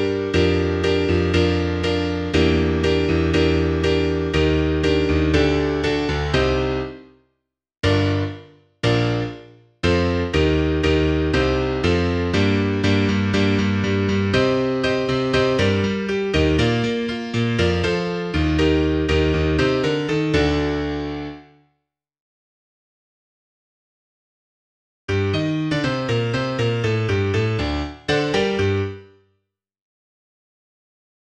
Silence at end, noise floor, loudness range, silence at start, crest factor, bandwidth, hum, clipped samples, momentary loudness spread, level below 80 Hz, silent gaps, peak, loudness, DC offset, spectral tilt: 2.3 s; -74 dBFS; 6 LU; 0 s; 16 dB; 9.6 kHz; none; under 0.1%; 6 LU; -32 dBFS; 22.20-25.08 s; -4 dBFS; -20 LUFS; under 0.1%; -6.5 dB/octave